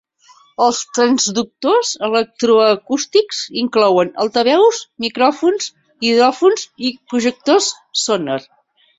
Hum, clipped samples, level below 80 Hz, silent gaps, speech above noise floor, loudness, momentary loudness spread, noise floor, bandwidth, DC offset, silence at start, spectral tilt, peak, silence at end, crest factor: none; under 0.1%; -64 dBFS; none; 35 dB; -16 LUFS; 9 LU; -50 dBFS; 8.2 kHz; under 0.1%; 0.6 s; -2.5 dB/octave; -2 dBFS; 0.6 s; 14 dB